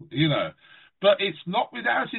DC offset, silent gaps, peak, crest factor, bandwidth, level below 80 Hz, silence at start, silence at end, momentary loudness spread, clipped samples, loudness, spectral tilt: under 0.1%; none; -8 dBFS; 18 dB; 4.2 kHz; -64 dBFS; 0 s; 0 s; 6 LU; under 0.1%; -24 LUFS; -3 dB/octave